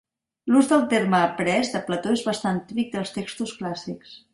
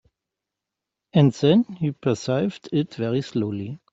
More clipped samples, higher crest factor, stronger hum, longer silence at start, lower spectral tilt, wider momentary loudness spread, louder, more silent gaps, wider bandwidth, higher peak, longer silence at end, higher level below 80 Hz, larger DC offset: neither; about the same, 18 dB vs 18 dB; neither; second, 0.45 s vs 1.15 s; second, -5 dB/octave vs -7.5 dB/octave; first, 13 LU vs 8 LU; about the same, -23 LUFS vs -23 LUFS; neither; first, 11.5 kHz vs 8 kHz; about the same, -6 dBFS vs -4 dBFS; about the same, 0.15 s vs 0.15 s; about the same, -62 dBFS vs -62 dBFS; neither